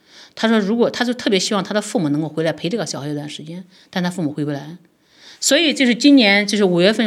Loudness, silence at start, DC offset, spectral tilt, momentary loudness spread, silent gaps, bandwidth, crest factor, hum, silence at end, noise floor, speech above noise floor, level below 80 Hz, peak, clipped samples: -17 LUFS; 0.15 s; under 0.1%; -4 dB/octave; 17 LU; none; 13.5 kHz; 16 dB; none; 0 s; -46 dBFS; 29 dB; -74 dBFS; -2 dBFS; under 0.1%